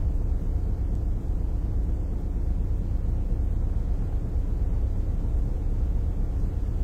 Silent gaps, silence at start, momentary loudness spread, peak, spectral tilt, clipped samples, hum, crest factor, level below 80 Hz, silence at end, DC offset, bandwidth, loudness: none; 0 s; 1 LU; -16 dBFS; -9.5 dB/octave; under 0.1%; none; 10 dB; -26 dBFS; 0 s; under 0.1%; 2.5 kHz; -30 LUFS